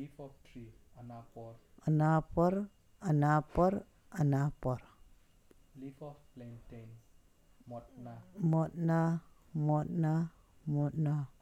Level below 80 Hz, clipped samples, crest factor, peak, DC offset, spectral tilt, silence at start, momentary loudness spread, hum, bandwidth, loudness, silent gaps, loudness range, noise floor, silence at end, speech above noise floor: -56 dBFS; under 0.1%; 18 dB; -18 dBFS; under 0.1%; -9.5 dB/octave; 0 s; 22 LU; none; 8.2 kHz; -33 LUFS; none; 14 LU; -64 dBFS; 0.15 s; 30 dB